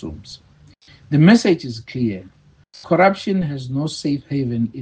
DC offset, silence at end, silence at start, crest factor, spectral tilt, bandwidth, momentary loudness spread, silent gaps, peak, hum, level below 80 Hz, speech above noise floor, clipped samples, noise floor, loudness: under 0.1%; 0 s; 0 s; 18 dB; -6.5 dB/octave; 9.4 kHz; 19 LU; none; 0 dBFS; none; -52 dBFS; 30 dB; under 0.1%; -48 dBFS; -18 LUFS